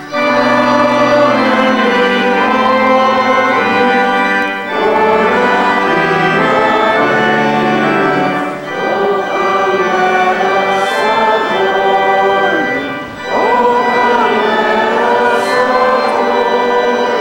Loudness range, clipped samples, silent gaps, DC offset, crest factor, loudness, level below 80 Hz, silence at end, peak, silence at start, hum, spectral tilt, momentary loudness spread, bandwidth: 2 LU; under 0.1%; none; under 0.1%; 10 dB; -11 LUFS; -50 dBFS; 0 s; 0 dBFS; 0 s; none; -5 dB/octave; 4 LU; 16.5 kHz